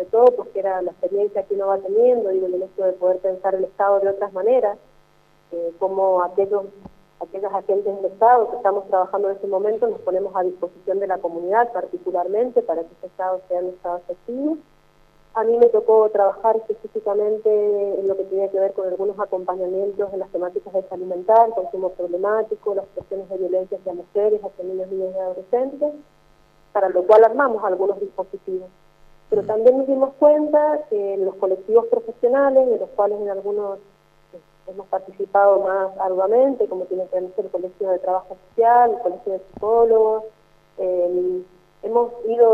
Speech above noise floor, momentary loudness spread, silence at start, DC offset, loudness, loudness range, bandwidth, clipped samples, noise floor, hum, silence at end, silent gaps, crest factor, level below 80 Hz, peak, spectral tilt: 36 dB; 13 LU; 0 s; under 0.1%; -20 LUFS; 5 LU; 4.8 kHz; under 0.1%; -56 dBFS; none; 0 s; none; 18 dB; -60 dBFS; -2 dBFS; -8 dB/octave